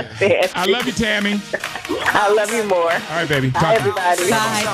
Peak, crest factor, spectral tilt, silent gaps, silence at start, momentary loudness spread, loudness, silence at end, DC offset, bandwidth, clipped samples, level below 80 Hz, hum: -4 dBFS; 14 dB; -4 dB/octave; none; 0 s; 5 LU; -17 LUFS; 0 s; under 0.1%; 15.5 kHz; under 0.1%; -48 dBFS; none